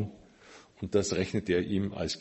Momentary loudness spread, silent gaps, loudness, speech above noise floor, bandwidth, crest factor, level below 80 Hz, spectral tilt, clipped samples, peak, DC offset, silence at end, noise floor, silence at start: 8 LU; none; -31 LUFS; 25 dB; 8.4 kHz; 18 dB; -52 dBFS; -5 dB/octave; under 0.1%; -14 dBFS; under 0.1%; 0 s; -55 dBFS; 0 s